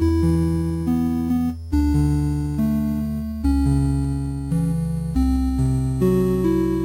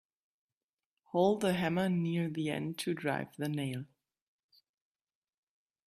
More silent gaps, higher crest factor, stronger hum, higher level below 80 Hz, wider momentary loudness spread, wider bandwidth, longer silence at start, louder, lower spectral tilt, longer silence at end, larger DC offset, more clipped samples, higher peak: neither; second, 12 dB vs 20 dB; neither; first, -28 dBFS vs -72 dBFS; second, 5 LU vs 8 LU; first, 16 kHz vs 14 kHz; second, 0 s vs 1.15 s; first, -21 LUFS vs -34 LUFS; first, -8.5 dB/octave vs -6.5 dB/octave; second, 0 s vs 2 s; neither; neither; first, -8 dBFS vs -16 dBFS